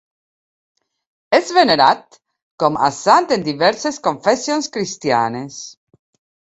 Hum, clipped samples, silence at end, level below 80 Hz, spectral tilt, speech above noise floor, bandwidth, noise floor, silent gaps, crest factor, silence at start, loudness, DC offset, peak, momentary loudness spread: none; under 0.1%; 0.75 s; -60 dBFS; -3.5 dB/octave; over 74 dB; 8.2 kHz; under -90 dBFS; 2.42-2.58 s; 18 dB; 1.3 s; -16 LUFS; under 0.1%; 0 dBFS; 10 LU